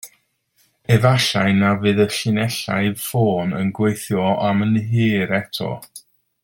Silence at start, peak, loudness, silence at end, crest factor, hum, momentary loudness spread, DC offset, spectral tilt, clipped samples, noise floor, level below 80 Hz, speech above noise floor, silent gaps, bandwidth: 0.05 s; -2 dBFS; -19 LUFS; 0.45 s; 18 dB; none; 6 LU; under 0.1%; -5.5 dB/octave; under 0.1%; -63 dBFS; -54 dBFS; 45 dB; none; 17 kHz